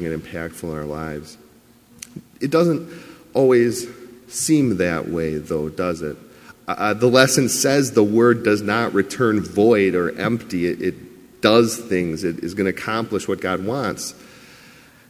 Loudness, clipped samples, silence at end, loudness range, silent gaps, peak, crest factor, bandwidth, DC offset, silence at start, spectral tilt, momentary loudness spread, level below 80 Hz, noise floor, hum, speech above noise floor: -20 LUFS; under 0.1%; 0.8 s; 6 LU; none; 0 dBFS; 20 dB; 16 kHz; under 0.1%; 0 s; -4.5 dB/octave; 15 LU; -50 dBFS; -51 dBFS; none; 31 dB